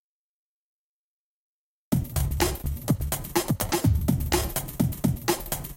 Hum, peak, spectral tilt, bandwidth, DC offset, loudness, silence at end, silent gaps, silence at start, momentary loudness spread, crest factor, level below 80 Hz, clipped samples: none; -10 dBFS; -5 dB/octave; 17 kHz; under 0.1%; -27 LUFS; 0 s; none; 1.9 s; 5 LU; 18 dB; -36 dBFS; under 0.1%